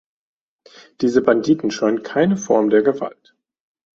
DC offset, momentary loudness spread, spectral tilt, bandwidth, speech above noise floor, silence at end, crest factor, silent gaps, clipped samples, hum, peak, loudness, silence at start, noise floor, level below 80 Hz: under 0.1%; 6 LU; -6 dB/octave; 7.8 kHz; 31 dB; 0.85 s; 18 dB; none; under 0.1%; none; -2 dBFS; -18 LUFS; 1 s; -48 dBFS; -60 dBFS